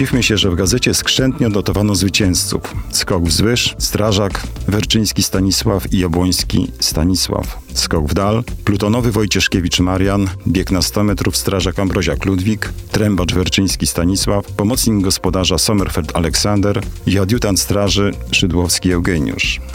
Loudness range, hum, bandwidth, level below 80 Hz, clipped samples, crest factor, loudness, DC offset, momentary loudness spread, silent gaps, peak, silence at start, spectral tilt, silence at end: 1 LU; none; 17 kHz; -28 dBFS; under 0.1%; 14 dB; -15 LUFS; under 0.1%; 5 LU; none; -2 dBFS; 0 s; -4 dB/octave; 0 s